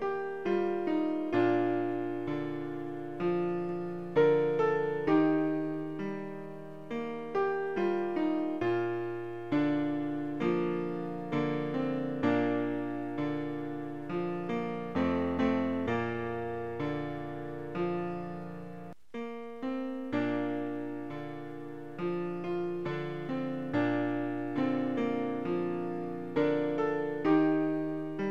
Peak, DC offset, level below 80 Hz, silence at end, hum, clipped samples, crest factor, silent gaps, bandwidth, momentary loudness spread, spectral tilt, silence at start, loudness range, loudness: -14 dBFS; 0.4%; -66 dBFS; 0 s; none; under 0.1%; 18 dB; none; 7 kHz; 11 LU; -8.5 dB/octave; 0 s; 7 LU; -32 LUFS